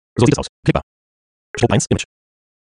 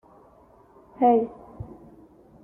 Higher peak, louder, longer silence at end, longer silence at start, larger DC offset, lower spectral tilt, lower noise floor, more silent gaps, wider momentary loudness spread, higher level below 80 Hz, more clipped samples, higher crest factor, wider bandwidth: first, 0 dBFS vs -8 dBFS; first, -18 LUFS vs -23 LUFS; second, 0.6 s vs 0.8 s; second, 0.15 s vs 1 s; neither; second, -5.5 dB/octave vs -10 dB/octave; first, under -90 dBFS vs -55 dBFS; first, 0.49-0.63 s, 0.83-1.54 s vs none; second, 10 LU vs 22 LU; first, -40 dBFS vs -58 dBFS; neither; about the same, 18 dB vs 20 dB; first, 10.5 kHz vs 3.3 kHz